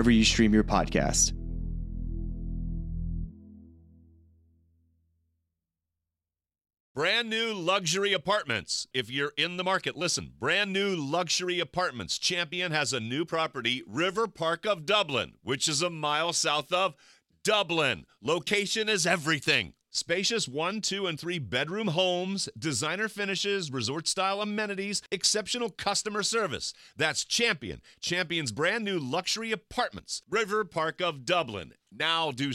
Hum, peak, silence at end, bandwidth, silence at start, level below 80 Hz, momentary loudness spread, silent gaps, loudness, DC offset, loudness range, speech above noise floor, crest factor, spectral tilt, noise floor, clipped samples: 50 Hz at -65 dBFS; -10 dBFS; 0 s; 15.5 kHz; 0 s; -44 dBFS; 9 LU; 6.80-6.95 s; -28 LUFS; under 0.1%; 5 LU; over 61 dB; 20 dB; -3 dB/octave; under -90 dBFS; under 0.1%